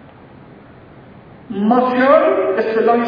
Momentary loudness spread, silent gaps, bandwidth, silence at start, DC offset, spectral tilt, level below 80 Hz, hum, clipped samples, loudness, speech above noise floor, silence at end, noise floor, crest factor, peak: 7 LU; none; 5.2 kHz; 1.5 s; under 0.1%; -8.5 dB/octave; -56 dBFS; none; under 0.1%; -14 LUFS; 27 dB; 0 s; -41 dBFS; 16 dB; 0 dBFS